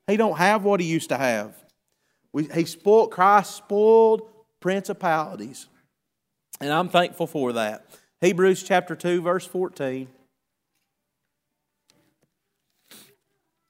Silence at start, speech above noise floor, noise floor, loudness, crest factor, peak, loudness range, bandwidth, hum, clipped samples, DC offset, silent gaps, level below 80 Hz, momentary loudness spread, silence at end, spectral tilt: 0.1 s; 59 dB; -81 dBFS; -22 LUFS; 22 dB; -2 dBFS; 9 LU; 16 kHz; none; under 0.1%; under 0.1%; none; -76 dBFS; 15 LU; 3.65 s; -5 dB/octave